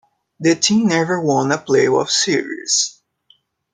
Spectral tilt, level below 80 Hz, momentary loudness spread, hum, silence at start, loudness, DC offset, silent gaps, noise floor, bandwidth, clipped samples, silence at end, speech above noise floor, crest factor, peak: -3.5 dB/octave; -62 dBFS; 5 LU; none; 0.4 s; -16 LUFS; under 0.1%; none; -57 dBFS; 10 kHz; under 0.1%; 0.85 s; 41 dB; 18 dB; 0 dBFS